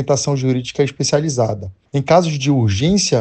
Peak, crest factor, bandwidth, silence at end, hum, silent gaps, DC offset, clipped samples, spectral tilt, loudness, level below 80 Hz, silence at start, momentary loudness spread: 0 dBFS; 16 dB; 9 kHz; 0 s; none; none; under 0.1%; under 0.1%; -5 dB/octave; -17 LUFS; -46 dBFS; 0 s; 7 LU